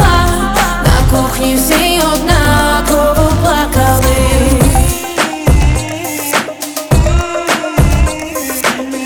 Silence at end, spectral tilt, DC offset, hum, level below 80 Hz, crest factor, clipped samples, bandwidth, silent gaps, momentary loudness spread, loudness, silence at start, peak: 0 s; -4.5 dB/octave; under 0.1%; none; -16 dBFS; 10 dB; under 0.1%; over 20 kHz; none; 5 LU; -12 LUFS; 0 s; 0 dBFS